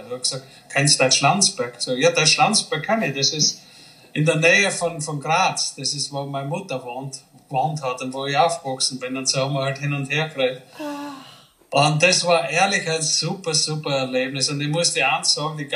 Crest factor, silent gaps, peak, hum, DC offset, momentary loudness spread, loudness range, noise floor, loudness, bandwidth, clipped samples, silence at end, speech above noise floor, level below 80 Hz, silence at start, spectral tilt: 20 dB; none; -2 dBFS; none; under 0.1%; 13 LU; 6 LU; -48 dBFS; -20 LUFS; 15 kHz; under 0.1%; 0 s; 27 dB; -70 dBFS; 0 s; -2.5 dB/octave